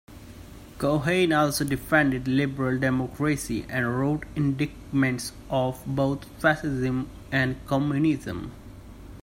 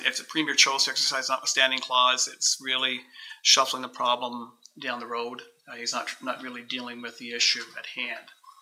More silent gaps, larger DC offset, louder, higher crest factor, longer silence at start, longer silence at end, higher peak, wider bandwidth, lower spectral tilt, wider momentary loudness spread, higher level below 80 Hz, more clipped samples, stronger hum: neither; neither; about the same, -26 LUFS vs -24 LUFS; about the same, 20 dB vs 24 dB; about the same, 0.1 s vs 0 s; about the same, 0.05 s vs 0.1 s; about the same, -6 dBFS vs -4 dBFS; about the same, 16 kHz vs 16 kHz; first, -6 dB/octave vs 0.5 dB/octave; first, 19 LU vs 16 LU; first, -48 dBFS vs under -90 dBFS; neither; neither